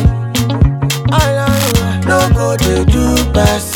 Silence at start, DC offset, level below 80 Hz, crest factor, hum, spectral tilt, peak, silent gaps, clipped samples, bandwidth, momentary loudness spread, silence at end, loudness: 0 s; under 0.1%; -20 dBFS; 12 dB; none; -5 dB/octave; 0 dBFS; none; 0.2%; over 20 kHz; 3 LU; 0 s; -12 LUFS